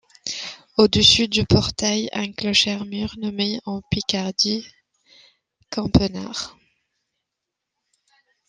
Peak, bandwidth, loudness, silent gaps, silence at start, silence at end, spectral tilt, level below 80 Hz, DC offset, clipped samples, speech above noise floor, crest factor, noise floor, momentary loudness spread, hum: -2 dBFS; 10 kHz; -20 LUFS; none; 0.25 s; 2 s; -4 dB/octave; -42 dBFS; under 0.1%; under 0.1%; 62 dB; 22 dB; -82 dBFS; 16 LU; none